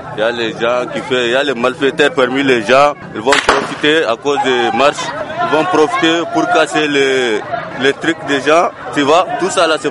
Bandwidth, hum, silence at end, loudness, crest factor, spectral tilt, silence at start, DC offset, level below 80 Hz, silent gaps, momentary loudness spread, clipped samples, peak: 11.5 kHz; none; 0 s; -13 LUFS; 14 dB; -3.5 dB/octave; 0 s; under 0.1%; -48 dBFS; none; 6 LU; under 0.1%; 0 dBFS